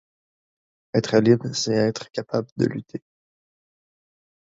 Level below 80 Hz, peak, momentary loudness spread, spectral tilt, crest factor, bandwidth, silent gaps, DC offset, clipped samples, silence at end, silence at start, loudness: -62 dBFS; -4 dBFS; 15 LU; -5.5 dB/octave; 22 dB; 7.8 kHz; 2.52-2.56 s; under 0.1%; under 0.1%; 1.55 s; 0.95 s; -22 LUFS